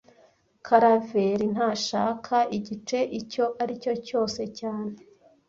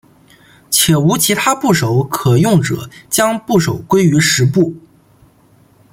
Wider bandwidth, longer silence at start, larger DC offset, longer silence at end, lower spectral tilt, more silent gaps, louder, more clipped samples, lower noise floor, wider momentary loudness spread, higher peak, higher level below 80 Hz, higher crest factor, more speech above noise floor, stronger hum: second, 7.8 kHz vs 17 kHz; about the same, 0.65 s vs 0.7 s; neither; second, 0.55 s vs 1.15 s; about the same, -5 dB/octave vs -4.5 dB/octave; neither; second, -26 LUFS vs -13 LUFS; neither; first, -61 dBFS vs -49 dBFS; first, 12 LU vs 5 LU; second, -6 dBFS vs 0 dBFS; second, -66 dBFS vs -48 dBFS; first, 20 dB vs 14 dB; about the same, 35 dB vs 36 dB; neither